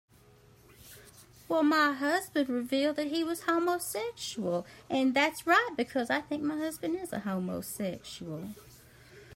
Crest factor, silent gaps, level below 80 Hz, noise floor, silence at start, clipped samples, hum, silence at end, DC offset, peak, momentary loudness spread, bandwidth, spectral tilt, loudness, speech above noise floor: 22 dB; none; -68 dBFS; -59 dBFS; 0.8 s; under 0.1%; none; 0 s; under 0.1%; -10 dBFS; 15 LU; 16 kHz; -4 dB/octave; -31 LUFS; 29 dB